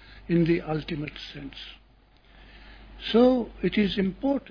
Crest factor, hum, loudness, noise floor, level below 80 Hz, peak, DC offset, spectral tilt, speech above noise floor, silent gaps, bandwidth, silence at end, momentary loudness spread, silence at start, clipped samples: 18 dB; none; -25 LUFS; -57 dBFS; -48 dBFS; -8 dBFS; under 0.1%; -8.5 dB/octave; 32 dB; none; 5.4 kHz; 0 s; 18 LU; 0.1 s; under 0.1%